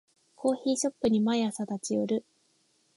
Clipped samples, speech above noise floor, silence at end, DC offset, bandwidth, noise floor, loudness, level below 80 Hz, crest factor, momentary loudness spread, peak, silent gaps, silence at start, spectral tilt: under 0.1%; 42 dB; 0.75 s; under 0.1%; 11.5 kHz; -70 dBFS; -29 LUFS; -68 dBFS; 16 dB; 6 LU; -14 dBFS; none; 0.4 s; -5 dB/octave